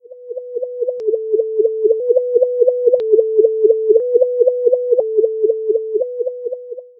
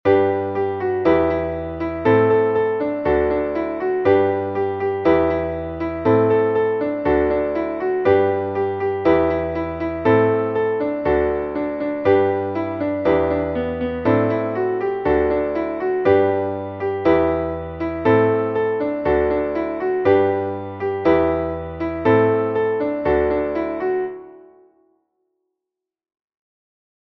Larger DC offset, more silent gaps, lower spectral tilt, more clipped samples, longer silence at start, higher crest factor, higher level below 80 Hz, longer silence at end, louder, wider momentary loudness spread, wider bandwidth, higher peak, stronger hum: neither; neither; second, -8 dB/octave vs -9.5 dB/octave; neither; about the same, 0.1 s vs 0.05 s; about the same, 14 dB vs 16 dB; second, -78 dBFS vs -42 dBFS; second, 0.15 s vs 2.7 s; first, -16 LUFS vs -19 LUFS; first, 12 LU vs 8 LU; second, 1.1 kHz vs 5.8 kHz; first, 0 dBFS vs -4 dBFS; neither